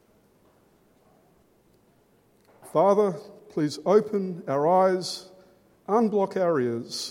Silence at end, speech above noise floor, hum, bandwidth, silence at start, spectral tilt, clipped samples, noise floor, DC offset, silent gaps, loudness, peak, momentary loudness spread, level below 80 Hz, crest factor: 0 s; 39 dB; none; 16 kHz; 2.65 s; -5.5 dB/octave; under 0.1%; -62 dBFS; under 0.1%; none; -24 LUFS; -8 dBFS; 13 LU; -74 dBFS; 18 dB